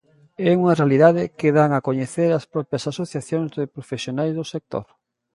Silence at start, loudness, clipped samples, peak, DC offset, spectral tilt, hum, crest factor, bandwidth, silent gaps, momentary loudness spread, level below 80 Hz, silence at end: 0.4 s; -21 LUFS; under 0.1%; -2 dBFS; under 0.1%; -7 dB/octave; none; 20 dB; 11.5 kHz; none; 13 LU; -62 dBFS; 0.5 s